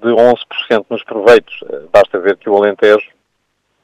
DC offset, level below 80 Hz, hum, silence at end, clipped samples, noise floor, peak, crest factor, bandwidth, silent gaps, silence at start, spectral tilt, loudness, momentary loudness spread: under 0.1%; -52 dBFS; none; 0.8 s; 0.8%; -66 dBFS; 0 dBFS; 12 dB; 11 kHz; none; 0 s; -5 dB/octave; -12 LUFS; 12 LU